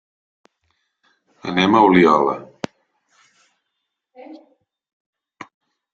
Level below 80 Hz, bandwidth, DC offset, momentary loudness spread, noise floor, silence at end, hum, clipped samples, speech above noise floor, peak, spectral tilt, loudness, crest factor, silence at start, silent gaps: -60 dBFS; 7.6 kHz; under 0.1%; 21 LU; -78 dBFS; 1.6 s; none; under 0.1%; 63 dB; -2 dBFS; -6.5 dB/octave; -15 LUFS; 20 dB; 1.45 s; none